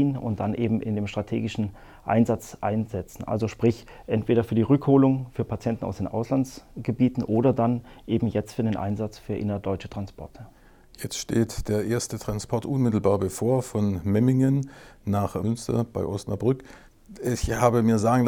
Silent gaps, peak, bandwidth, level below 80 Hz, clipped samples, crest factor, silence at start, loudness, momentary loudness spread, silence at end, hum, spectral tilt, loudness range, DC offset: none; -6 dBFS; 17.5 kHz; -46 dBFS; under 0.1%; 20 dB; 0 s; -25 LUFS; 11 LU; 0 s; none; -7 dB/octave; 6 LU; under 0.1%